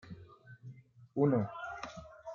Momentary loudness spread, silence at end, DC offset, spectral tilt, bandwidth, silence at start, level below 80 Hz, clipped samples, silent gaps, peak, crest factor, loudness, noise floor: 23 LU; 0 s; under 0.1%; -8.5 dB/octave; 7.2 kHz; 0.05 s; -68 dBFS; under 0.1%; none; -16 dBFS; 20 dB; -35 LUFS; -56 dBFS